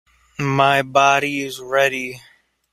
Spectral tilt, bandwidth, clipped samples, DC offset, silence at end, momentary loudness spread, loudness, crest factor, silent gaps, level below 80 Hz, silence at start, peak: -4 dB/octave; 15.5 kHz; under 0.1%; under 0.1%; 0.55 s; 12 LU; -18 LUFS; 18 dB; none; -60 dBFS; 0.4 s; -2 dBFS